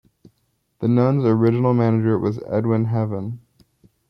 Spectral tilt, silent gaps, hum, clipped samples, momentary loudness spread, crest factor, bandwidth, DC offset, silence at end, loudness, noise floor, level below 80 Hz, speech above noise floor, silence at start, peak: -11 dB/octave; none; none; under 0.1%; 9 LU; 14 dB; 5.6 kHz; under 0.1%; 0.7 s; -20 LUFS; -68 dBFS; -60 dBFS; 50 dB; 0.8 s; -6 dBFS